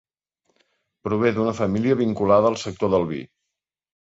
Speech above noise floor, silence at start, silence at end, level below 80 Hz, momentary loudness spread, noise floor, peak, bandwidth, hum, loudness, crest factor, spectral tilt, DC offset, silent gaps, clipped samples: 62 dB; 1.05 s; 0.8 s; -52 dBFS; 10 LU; -83 dBFS; -6 dBFS; 8 kHz; none; -21 LUFS; 18 dB; -7 dB/octave; under 0.1%; none; under 0.1%